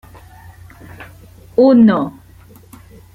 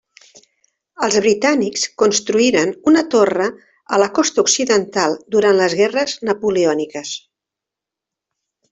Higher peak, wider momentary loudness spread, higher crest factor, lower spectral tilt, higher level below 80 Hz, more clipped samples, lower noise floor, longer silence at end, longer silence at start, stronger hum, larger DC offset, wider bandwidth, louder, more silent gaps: about the same, -2 dBFS vs -2 dBFS; first, 27 LU vs 8 LU; about the same, 16 dB vs 16 dB; first, -8.5 dB/octave vs -3 dB/octave; first, -48 dBFS vs -60 dBFS; neither; second, -42 dBFS vs -85 dBFS; second, 1.05 s vs 1.55 s; about the same, 1 s vs 1 s; neither; neither; first, 14 kHz vs 8.4 kHz; first, -12 LUFS vs -16 LUFS; neither